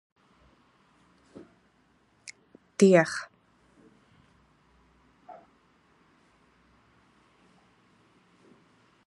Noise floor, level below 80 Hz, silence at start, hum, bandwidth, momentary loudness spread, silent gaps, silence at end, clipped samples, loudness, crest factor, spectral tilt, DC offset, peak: -66 dBFS; -74 dBFS; 2.8 s; none; 11 kHz; 32 LU; none; 3.75 s; under 0.1%; -23 LUFS; 28 dB; -6 dB/octave; under 0.1%; -6 dBFS